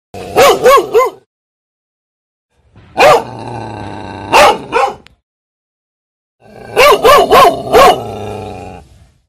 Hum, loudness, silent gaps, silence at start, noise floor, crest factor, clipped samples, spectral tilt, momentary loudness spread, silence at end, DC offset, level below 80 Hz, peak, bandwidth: none; -8 LUFS; 1.26-2.49 s, 5.23-6.39 s; 0.15 s; -41 dBFS; 12 dB; 0.7%; -3 dB/octave; 19 LU; 0.5 s; under 0.1%; -38 dBFS; 0 dBFS; over 20 kHz